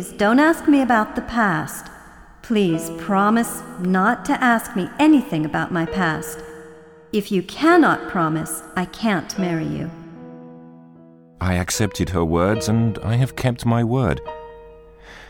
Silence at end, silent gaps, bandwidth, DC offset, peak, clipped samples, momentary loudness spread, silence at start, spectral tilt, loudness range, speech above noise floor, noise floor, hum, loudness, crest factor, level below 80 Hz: 0 s; none; 19 kHz; under 0.1%; -4 dBFS; under 0.1%; 17 LU; 0 s; -6 dB/octave; 6 LU; 27 dB; -46 dBFS; none; -20 LUFS; 16 dB; -44 dBFS